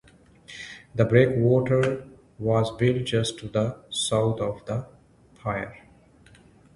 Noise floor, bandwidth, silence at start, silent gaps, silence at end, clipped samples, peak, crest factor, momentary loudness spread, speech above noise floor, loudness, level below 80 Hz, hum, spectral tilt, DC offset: -55 dBFS; 11.5 kHz; 0.5 s; none; 1 s; under 0.1%; -4 dBFS; 22 dB; 15 LU; 32 dB; -25 LUFS; -52 dBFS; none; -6 dB/octave; under 0.1%